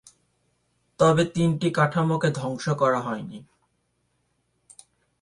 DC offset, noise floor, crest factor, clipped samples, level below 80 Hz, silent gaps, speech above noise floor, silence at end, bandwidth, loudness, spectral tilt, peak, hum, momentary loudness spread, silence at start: under 0.1%; -72 dBFS; 20 dB; under 0.1%; -60 dBFS; none; 49 dB; 1.8 s; 11.5 kHz; -23 LUFS; -6.5 dB/octave; -6 dBFS; none; 13 LU; 1 s